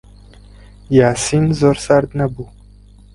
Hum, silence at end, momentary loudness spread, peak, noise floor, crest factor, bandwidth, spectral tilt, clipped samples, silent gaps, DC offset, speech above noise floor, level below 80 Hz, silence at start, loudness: 50 Hz at -35 dBFS; 0.7 s; 12 LU; 0 dBFS; -43 dBFS; 16 dB; 11.5 kHz; -6 dB/octave; under 0.1%; none; under 0.1%; 28 dB; -40 dBFS; 0.9 s; -15 LUFS